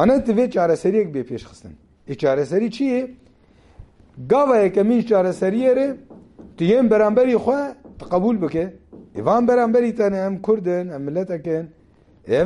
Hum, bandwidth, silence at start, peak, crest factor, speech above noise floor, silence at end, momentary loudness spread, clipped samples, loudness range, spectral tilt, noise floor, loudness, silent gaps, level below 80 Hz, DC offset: none; 11.5 kHz; 0 s; -4 dBFS; 16 dB; 34 dB; 0 s; 14 LU; under 0.1%; 4 LU; -7.5 dB/octave; -52 dBFS; -19 LUFS; none; -50 dBFS; under 0.1%